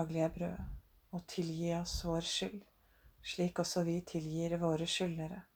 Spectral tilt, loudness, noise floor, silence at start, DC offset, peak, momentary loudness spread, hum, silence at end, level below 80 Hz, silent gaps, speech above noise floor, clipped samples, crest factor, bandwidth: -5 dB/octave; -38 LUFS; -66 dBFS; 0 s; under 0.1%; -22 dBFS; 13 LU; none; 0.15 s; -54 dBFS; none; 29 dB; under 0.1%; 16 dB; 20 kHz